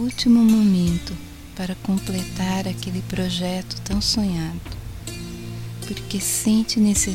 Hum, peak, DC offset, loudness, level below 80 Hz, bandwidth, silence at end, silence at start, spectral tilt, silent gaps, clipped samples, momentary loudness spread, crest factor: none; -6 dBFS; under 0.1%; -21 LUFS; -38 dBFS; 16.5 kHz; 0 s; 0 s; -4.5 dB/octave; none; under 0.1%; 17 LU; 16 dB